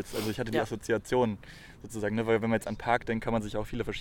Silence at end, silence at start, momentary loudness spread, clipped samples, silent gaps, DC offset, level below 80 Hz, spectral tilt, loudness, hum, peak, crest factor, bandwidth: 0 s; 0 s; 10 LU; under 0.1%; none; under 0.1%; -50 dBFS; -5.5 dB/octave; -31 LUFS; none; -10 dBFS; 20 dB; 18 kHz